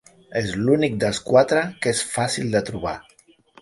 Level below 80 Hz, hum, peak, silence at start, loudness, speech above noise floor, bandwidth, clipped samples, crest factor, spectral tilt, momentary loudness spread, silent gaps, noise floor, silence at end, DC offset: -50 dBFS; none; -2 dBFS; 0.3 s; -21 LUFS; 32 dB; 11.5 kHz; under 0.1%; 20 dB; -4.5 dB/octave; 12 LU; none; -53 dBFS; 0.6 s; under 0.1%